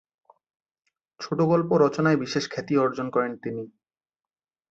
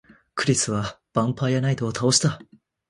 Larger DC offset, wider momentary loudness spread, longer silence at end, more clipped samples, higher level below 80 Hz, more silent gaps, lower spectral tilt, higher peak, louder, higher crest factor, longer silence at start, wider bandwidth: neither; first, 14 LU vs 9 LU; first, 1 s vs 0.45 s; neither; second, -68 dBFS vs -54 dBFS; neither; first, -6.5 dB/octave vs -4 dB/octave; second, -8 dBFS vs -4 dBFS; about the same, -24 LUFS vs -23 LUFS; about the same, 18 dB vs 20 dB; first, 1.2 s vs 0.35 s; second, 8 kHz vs 11.5 kHz